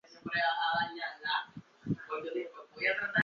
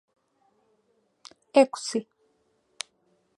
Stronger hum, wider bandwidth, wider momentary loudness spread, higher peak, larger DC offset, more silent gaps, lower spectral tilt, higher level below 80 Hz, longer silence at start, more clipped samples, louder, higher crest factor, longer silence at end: neither; second, 7.2 kHz vs 11.5 kHz; second, 11 LU vs 18 LU; second, -16 dBFS vs -4 dBFS; neither; neither; second, -1.5 dB/octave vs -3 dB/octave; first, -68 dBFS vs -88 dBFS; second, 0.1 s vs 1.55 s; neither; second, -34 LUFS vs -25 LUFS; second, 20 dB vs 26 dB; second, 0 s vs 1.35 s